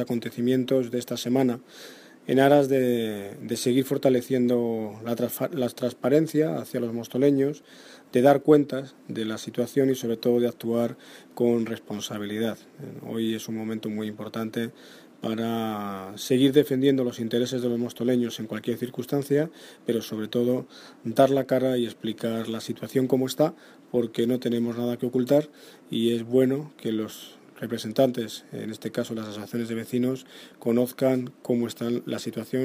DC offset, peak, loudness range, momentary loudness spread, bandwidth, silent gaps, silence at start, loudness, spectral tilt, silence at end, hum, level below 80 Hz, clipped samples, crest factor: under 0.1%; -4 dBFS; 6 LU; 13 LU; 15.5 kHz; none; 0 s; -26 LUFS; -6 dB/octave; 0 s; none; -72 dBFS; under 0.1%; 20 dB